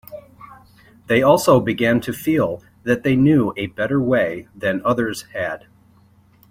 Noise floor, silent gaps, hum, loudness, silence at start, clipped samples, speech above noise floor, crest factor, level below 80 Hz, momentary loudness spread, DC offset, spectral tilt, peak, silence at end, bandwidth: -53 dBFS; none; none; -19 LUFS; 0.1 s; under 0.1%; 35 dB; 18 dB; -52 dBFS; 12 LU; under 0.1%; -6 dB/octave; -2 dBFS; 0.95 s; 16.5 kHz